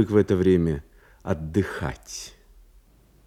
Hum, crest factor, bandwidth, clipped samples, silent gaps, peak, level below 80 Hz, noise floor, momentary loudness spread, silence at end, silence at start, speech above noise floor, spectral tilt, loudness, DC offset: none; 20 dB; 15 kHz; under 0.1%; none; -6 dBFS; -46 dBFS; -56 dBFS; 17 LU; 0.95 s; 0 s; 33 dB; -7 dB/octave; -24 LUFS; under 0.1%